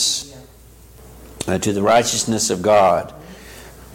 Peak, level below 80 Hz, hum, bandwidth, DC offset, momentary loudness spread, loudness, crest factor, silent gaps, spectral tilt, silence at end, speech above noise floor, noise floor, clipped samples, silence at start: -4 dBFS; -46 dBFS; none; 17 kHz; under 0.1%; 24 LU; -17 LUFS; 14 dB; none; -3 dB/octave; 0 s; 28 dB; -44 dBFS; under 0.1%; 0 s